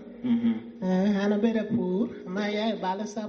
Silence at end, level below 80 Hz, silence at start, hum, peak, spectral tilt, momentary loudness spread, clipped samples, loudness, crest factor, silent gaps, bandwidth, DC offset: 0 s; -64 dBFS; 0 s; none; -12 dBFS; -6 dB/octave; 6 LU; under 0.1%; -27 LUFS; 14 dB; none; 7 kHz; under 0.1%